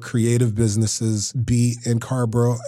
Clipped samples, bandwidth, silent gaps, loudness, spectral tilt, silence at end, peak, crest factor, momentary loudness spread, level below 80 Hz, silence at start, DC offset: under 0.1%; 13.5 kHz; none; -21 LUFS; -6 dB/octave; 0 s; -6 dBFS; 14 dB; 4 LU; -46 dBFS; 0 s; under 0.1%